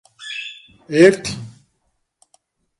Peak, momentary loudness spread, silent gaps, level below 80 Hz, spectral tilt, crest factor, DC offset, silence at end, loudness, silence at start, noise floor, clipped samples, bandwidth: 0 dBFS; 20 LU; none; -56 dBFS; -5 dB/octave; 20 dB; under 0.1%; 1.3 s; -17 LUFS; 0.2 s; -70 dBFS; under 0.1%; 11.5 kHz